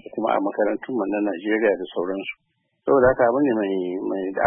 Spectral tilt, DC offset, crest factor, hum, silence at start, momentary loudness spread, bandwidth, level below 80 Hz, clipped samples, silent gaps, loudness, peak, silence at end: -11 dB/octave; under 0.1%; 18 dB; none; 0.15 s; 10 LU; 3.6 kHz; -52 dBFS; under 0.1%; none; -22 LUFS; -4 dBFS; 0 s